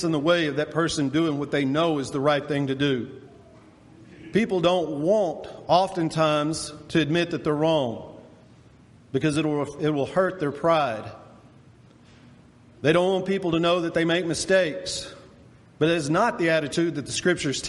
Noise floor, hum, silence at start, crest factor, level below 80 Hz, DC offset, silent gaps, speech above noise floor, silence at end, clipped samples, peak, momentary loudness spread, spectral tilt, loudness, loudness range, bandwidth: -52 dBFS; none; 0 s; 20 dB; -58 dBFS; under 0.1%; none; 29 dB; 0 s; under 0.1%; -6 dBFS; 7 LU; -5 dB/octave; -24 LUFS; 3 LU; 11.5 kHz